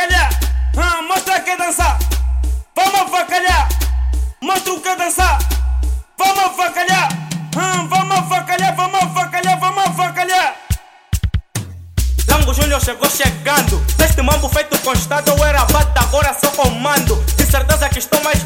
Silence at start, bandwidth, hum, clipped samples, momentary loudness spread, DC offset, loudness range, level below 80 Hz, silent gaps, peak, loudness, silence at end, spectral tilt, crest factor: 0 s; 18.5 kHz; none; under 0.1%; 7 LU; under 0.1%; 3 LU; -20 dBFS; none; 0 dBFS; -15 LUFS; 0 s; -3.5 dB/octave; 14 dB